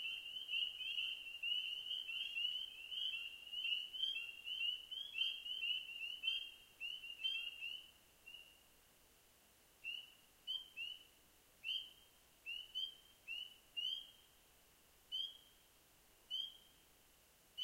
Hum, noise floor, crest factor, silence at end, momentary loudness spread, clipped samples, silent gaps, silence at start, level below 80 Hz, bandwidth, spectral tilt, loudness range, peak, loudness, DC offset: none; -70 dBFS; 20 dB; 0 s; 15 LU; under 0.1%; none; 0 s; -80 dBFS; 16 kHz; 1.5 dB/octave; 9 LU; -28 dBFS; -43 LUFS; under 0.1%